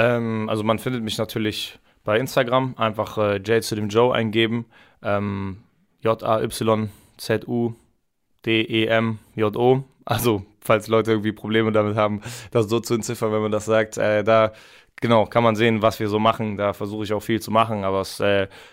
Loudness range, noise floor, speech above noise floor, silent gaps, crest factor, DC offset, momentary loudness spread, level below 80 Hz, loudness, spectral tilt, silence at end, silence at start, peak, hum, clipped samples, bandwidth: 4 LU; -71 dBFS; 49 dB; none; 16 dB; under 0.1%; 8 LU; -56 dBFS; -22 LUFS; -5.5 dB/octave; 0.05 s; 0 s; -6 dBFS; none; under 0.1%; 16 kHz